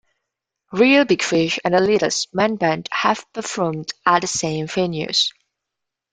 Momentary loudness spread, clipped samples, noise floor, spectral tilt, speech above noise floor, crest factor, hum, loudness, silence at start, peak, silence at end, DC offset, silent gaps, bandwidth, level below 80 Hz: 8 LU; under 0.1%; -83 dBFS; -3.5 dB/octave; 64 dB; 18 dB; none; -19 LUFS; 0.7 s; -2 dBFS; 0.8 s; under 0.1%; none; 9.6 kHz; -58 dBFS